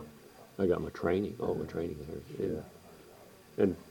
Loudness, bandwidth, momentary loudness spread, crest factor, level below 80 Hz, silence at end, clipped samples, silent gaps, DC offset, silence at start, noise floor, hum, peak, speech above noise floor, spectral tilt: -34 LUFS; 19 kHz; 23 LU; 20 dB; -58 dBFS; 0 s; under 0.1%; none; under 0.1%; 0 s; -55 dBFS; none; -14 dBFS; 22 dB; -7.5 dB/octave